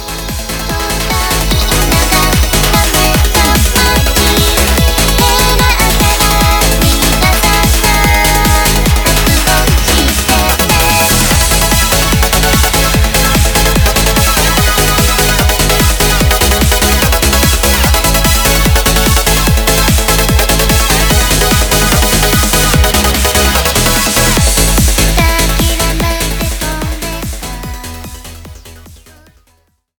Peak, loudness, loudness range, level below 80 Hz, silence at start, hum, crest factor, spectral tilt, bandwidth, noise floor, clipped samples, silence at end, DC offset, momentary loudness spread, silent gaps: 0 dBFS; -9 LUFS; 3 LU; -14 dBFS; 0 s; none; 10 dB; -3 dB/octave; over 20 kHz; -54 dBFS; under 0.1%; 1.05 s; under 0.1%; 6 LU; none